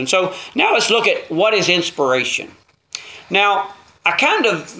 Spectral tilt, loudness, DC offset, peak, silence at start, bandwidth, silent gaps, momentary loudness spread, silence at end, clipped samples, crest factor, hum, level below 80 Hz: -2.5 dB/octave; -16 LUFS; under 0.1%; 0 dBFS; 0 s; 8 kHz; none; 17 LU; 0 s; under 0.1%; 18 dB; none; -64 dBFS